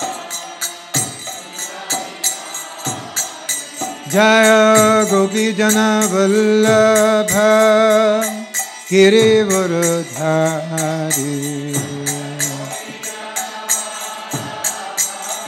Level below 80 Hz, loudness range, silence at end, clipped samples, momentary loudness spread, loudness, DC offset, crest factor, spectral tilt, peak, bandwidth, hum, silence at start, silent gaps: -62 dBFS; 9 LU; 0 s; under 0.1%; 15 LU; -16 LUFS; under 0.1%; 16 dB; -3.5 dB/octave; 0 dBFS; 18 kHz; none; 0 s; none